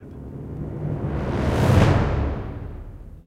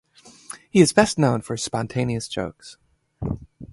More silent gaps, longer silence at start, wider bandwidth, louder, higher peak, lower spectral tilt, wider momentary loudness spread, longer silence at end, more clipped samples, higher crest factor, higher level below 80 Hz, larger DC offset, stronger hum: neither; second, 0 s vs 0.25 s; first, 15 kHz vs 12 kHz; about the same, -22 LUFS vs -22 LUFS; second, -4 dBFS vs 0 dBFS; first, -7.5 dB/octave vs -5 dB/octave; first, 20 LU vs 17 LU; about the same, 0.05 s vs 0.05 s; neither; about the same, 18 dB vs 22 dB; first, -30 dBFS vs -48 dBFS; neither; neither